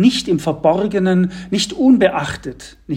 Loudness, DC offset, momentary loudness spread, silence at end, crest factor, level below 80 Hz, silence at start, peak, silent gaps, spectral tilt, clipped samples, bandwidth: -16 LUFS; under 0.1%; 14 LU; 0 s; 16 dB; -44 dBFS; 0 s; 0 dBFS; none; -5.5 dB/octave; under 0.1%; 14 kHz